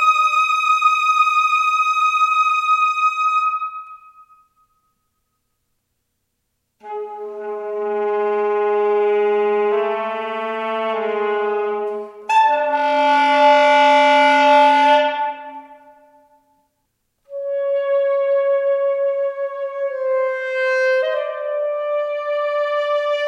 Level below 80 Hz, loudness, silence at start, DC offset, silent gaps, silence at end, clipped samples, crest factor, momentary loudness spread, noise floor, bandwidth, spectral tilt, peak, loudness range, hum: -76 dBFS; -17 LUFS; 0 s; under 0.1%; none; 0 s; under 0.1%; 16 dB; 13 LU; -73 dBFS; 12 kHz; -2 dB/octave; -2 dBFS; 11 LU; none